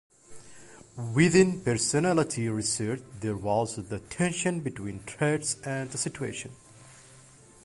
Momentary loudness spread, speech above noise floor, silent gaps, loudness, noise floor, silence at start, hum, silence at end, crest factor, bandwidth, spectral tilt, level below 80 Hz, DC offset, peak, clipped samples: 15 LU; 26 dB; none; -28 LUFS; -54 dBFS; 0.3 s; none; 0.45 s; 20 dB; 11.5 kHz; -4.5 dB/octave; -58 dBFS; under 0.1%; -8 dBFS; under 0.1%